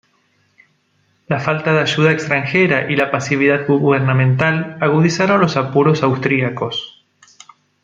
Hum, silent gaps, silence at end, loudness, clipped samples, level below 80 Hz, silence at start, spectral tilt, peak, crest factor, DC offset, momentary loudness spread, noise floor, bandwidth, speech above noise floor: none; none; 0.95 s; -15 LUFS; under 0.1%; -56 dBFS; 1.3 s; -6 dB/octave; -2 dBFS; 16 dB; under 0.1%; 6 LU; -61 dBFS; 7.6 kHz; 46 dB